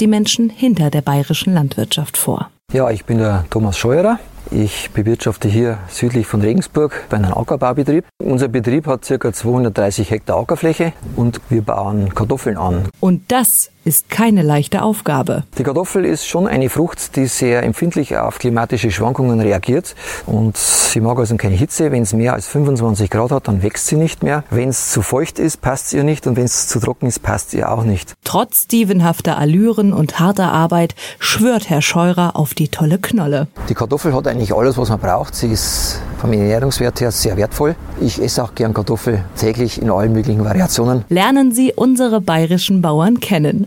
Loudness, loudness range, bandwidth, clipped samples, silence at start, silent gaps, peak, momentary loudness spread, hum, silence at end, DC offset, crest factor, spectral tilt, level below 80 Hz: -15 LUFS; 3 LU; 17 kHz; under 0.1%; 0 s; none; 0 dBFS; 6 LU; none; 0 s; under 0.1%; 14 dB; -5 dB/octave; -36 dBFS